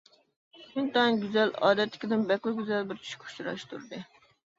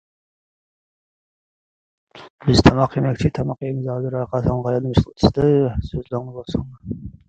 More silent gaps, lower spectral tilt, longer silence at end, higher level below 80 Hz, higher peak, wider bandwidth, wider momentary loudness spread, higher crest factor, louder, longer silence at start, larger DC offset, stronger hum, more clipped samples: second, none vs 2.30-2.38 s; second, -5.5 dB/octave vs -7 dB/octave; first, 0.55 s vs 0.2 s; second, -74 dBFS vs -36 dBFS; second, -10 dBFS vs 0 dBFS; second, 7.8 kHz vs 9 kHz; first, 16 LU vs 13 LU; about the same, 20 dB vs 20 dB; second, -29 LUFS vs -20 LUFS; second, 0.55 s vs 2.15 s; neither; neither; neither